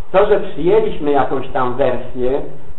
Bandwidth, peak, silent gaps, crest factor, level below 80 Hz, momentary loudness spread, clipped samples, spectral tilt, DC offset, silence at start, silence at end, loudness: 4.1 kHz; -2 dBFS; none; 16 dB; -36 dBFS; 6 LU; under 0.1%; -8.5 dB/octave; 10%; 0 s; 0 s; -17 LUFS